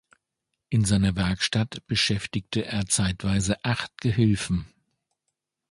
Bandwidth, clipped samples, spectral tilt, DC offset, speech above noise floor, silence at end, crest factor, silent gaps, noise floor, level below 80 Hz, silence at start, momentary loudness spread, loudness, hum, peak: 11.5 kHz; under 0.1%; -4.5 dB/octave; under 0.1%; 58 dB; 1.05 s; 18 dB; none; -82 dBFS; -44 dBFS; 0.7 s; 6 LU; -25 LUFS; none; -8 dBFS